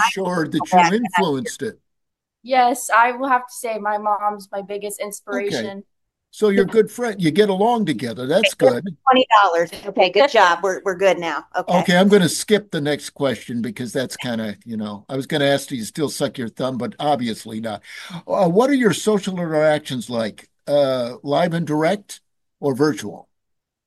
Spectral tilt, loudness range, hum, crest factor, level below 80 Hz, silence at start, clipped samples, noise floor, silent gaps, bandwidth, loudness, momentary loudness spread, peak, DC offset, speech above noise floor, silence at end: -4.5 dB/octave; 7 LU; none; 18 dB; -62 dBFS; 0 s; under 0.1%; -79 dBFS; none; 12.5 kHz; -19 LUFS; 14 LU; -2 dBFS; under 0.1%; 60 dB; 0.65 s